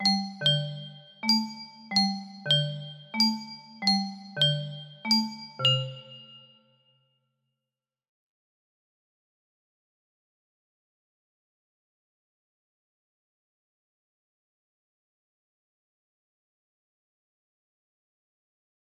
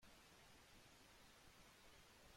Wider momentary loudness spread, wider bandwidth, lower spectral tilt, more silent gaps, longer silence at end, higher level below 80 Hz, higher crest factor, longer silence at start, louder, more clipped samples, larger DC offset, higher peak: first, 16 LU vs 0 LU; second, 13.5 kHz vs 16.5 kHz; first, -4 dB/octave vs -2.5 dB/octave; neither; first, 12.45 s vs 0 s; about the same, -76 dBFS vs -76 dBFS; first, 22 dB vs 14 dB; about the same, 0 s vs 0 s; first, -26 LUFS vs -67 LUFS; neither; neither; first, -10 dBFS vs -54 dBFS